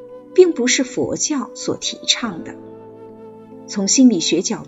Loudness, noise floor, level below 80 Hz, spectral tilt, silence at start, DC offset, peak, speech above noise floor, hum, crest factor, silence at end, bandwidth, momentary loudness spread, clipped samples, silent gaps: -17 LUFS; -38 dBFS; -60 dBFS; -3 dB/octave; 0 s; under 0.1%; 0 dBFS; 21 dB; none; 18 dB; 0 s; 8 kHz; 15 LU; under 0.1%; none